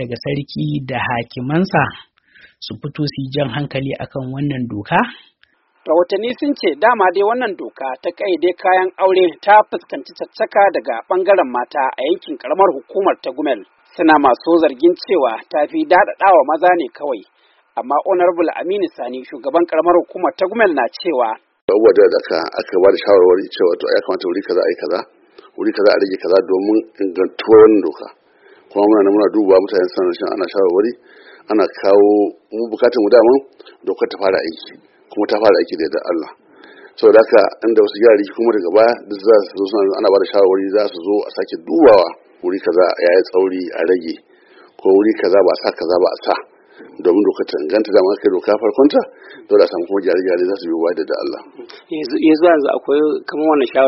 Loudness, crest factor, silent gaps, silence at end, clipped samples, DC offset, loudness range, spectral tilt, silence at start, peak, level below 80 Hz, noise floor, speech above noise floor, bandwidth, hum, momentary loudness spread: -15 LUFS; 14 dB; 21.62-21.68 s; 0 s; under 0.1%; under 0.1%; 5 LU; -4 dB/octave; 0 s; 0 dBFS; -58 dBFS; -57 dBFS; 43 dB; 6 kHz; none; 12 LU